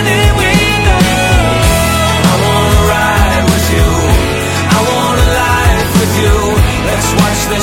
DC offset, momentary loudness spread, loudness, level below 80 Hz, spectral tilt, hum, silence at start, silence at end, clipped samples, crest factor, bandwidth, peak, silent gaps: 0.3%; 2 LU; -10 LUFS; -16 dBFS; -4.5 dB/octave; none; 0 s; 0 s; 0.1%; 10 dB; 17 kHz; 0 dBFS; none